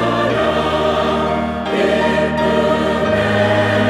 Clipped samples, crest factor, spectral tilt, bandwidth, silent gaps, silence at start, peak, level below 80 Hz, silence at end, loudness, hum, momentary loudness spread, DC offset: under 0.1%; 12 dB; -6 dB/octave; 13.5 kHz; none; 0 s; -4 dBFS; -38 dBFS; 0 s; -16 LUFS; none; 3 LU; under 0.1%